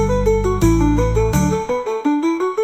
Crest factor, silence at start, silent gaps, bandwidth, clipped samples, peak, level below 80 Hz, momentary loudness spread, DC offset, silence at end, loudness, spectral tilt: 14 dB; 0 s; none; 15.5 kHz; under 0.1%; -2 dBFS; -24 dBFS; 4 LU; 0.2%; 0 s; -17 LUFS; -7 dB/octave